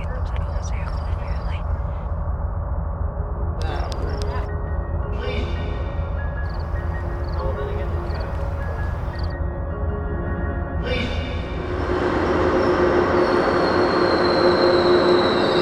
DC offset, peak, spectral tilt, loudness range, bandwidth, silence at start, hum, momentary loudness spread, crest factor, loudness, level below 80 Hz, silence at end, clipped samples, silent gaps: under 0.1%; -4 dBFS; -7 dB/octave; 9 LU; 9.4 kHz; 0 s; none; 10 LU; 18 dB; -23 LUFS; -28 dBFS; 0 s; under 0.1%; none